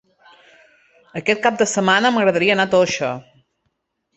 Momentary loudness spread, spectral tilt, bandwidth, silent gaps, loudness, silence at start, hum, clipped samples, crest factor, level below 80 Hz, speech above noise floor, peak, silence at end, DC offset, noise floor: 10 LU; -3.5 dB/octave; 8.2 kHz; none; -17 LUFS; 1.15 s; none; under 0.1%; 18 dB; -60 dBFS; 55 dB; -2 dBFS; 0.95 s; under 0.1%; -72 dBFS